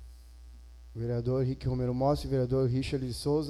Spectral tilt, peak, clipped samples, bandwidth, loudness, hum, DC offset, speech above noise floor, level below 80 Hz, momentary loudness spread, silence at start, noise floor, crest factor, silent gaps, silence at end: -7.5 dB/octave; -16 dBFS; under 0.1%; 12.5 kHz; -31 LUFS; none; under 0.1%; 20 dB; -46 dBFS; 6 LU; 0 s; -50 dBFS; 14 dB; none; 0 s